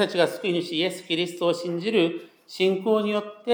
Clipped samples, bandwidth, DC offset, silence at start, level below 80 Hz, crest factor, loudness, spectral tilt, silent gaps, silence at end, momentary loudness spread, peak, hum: under 0.1%; over 20 kHz; under 0.1%; 0 s; -86 dBFS; 18 dB; -25 LUFS; -5 dB/octave; none; 0 s; 5 LU; -6 dBFS; none